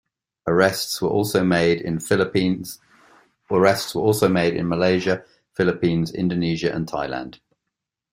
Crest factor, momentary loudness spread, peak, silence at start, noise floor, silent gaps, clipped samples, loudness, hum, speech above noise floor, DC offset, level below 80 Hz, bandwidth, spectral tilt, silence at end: 20 dB; 11 LU; -2 dBFS; 0.45 s; -82 dBFS; none; under 0.1%; -21 LUFS; none; 62 dB; under 0.1%; -54 dBFS; 16 kHz; -5.5 dB/octave; 0.8 s